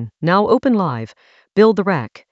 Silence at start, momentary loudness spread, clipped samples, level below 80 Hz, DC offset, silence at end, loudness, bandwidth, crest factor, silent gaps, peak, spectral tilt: 0 s; 10 LU; under 0.1%; -58 dBFS; under 0.1%; 0.25 s; -16 LUFS; 7.8 kHz; 16 dB; none; -2 dBFS; -8 dB/octave